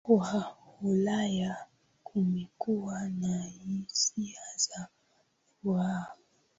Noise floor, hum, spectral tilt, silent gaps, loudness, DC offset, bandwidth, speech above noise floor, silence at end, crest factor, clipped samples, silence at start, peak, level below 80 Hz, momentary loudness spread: -71 dBFS; none; -4.5 dB/octave; none; -32 LUFS; under 0.1%; 8 kHz; 40 dB; 0.45 s; 20 dB; under 0.1%; 0.05 s; -12 dBFS; -68 dBFS; 10 LU